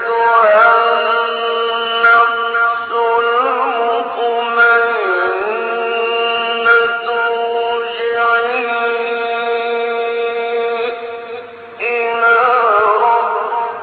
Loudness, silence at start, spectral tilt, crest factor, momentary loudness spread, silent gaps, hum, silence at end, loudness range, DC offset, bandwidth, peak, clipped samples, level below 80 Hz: -14 LUFS; 0 s; -5 dB/octave; 14 dB; 8 LU; none; none; 0 s; 4 LU; under 0.1%; 4.8 kHz; 0 dBFS; under 0.1%; -64 dBFS